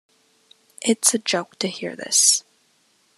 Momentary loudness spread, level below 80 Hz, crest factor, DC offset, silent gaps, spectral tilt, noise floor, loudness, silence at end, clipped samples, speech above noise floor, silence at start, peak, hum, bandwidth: 12 LU; -82 dBFS; 22 dB; under 0.1%; none; -1 dB/octave; -62 dBFS; -19 LUFS; 0.8 s; under 0.1%; 41 dB; 0.8 s; -2 dBFS; none; 13.5 kHz